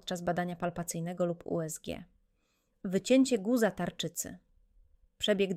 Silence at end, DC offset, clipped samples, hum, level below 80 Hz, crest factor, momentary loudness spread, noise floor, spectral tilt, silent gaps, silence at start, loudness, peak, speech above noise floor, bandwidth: 0 s; under 0.1%; under 0.1%; none; -64 dBFS; 20 dB; 14 LU; -75 dBFS; -4.5 dB/octave; none; 0.05 s; -32 LUFS; -14 dBFS; 44 dB; 16 kHz